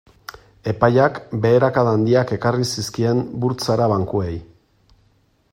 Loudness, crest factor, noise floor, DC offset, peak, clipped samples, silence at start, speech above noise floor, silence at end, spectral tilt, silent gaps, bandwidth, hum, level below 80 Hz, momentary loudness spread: -19 LUFS; 18 dB; -60 dBFS; under 0.1%; 0 dBFS; under 0.1%; 0.65 s; 42 dB; 1.1 s; -6.5 dB/octave; none; 16 kHz; none; -50 dBFS; 14 LU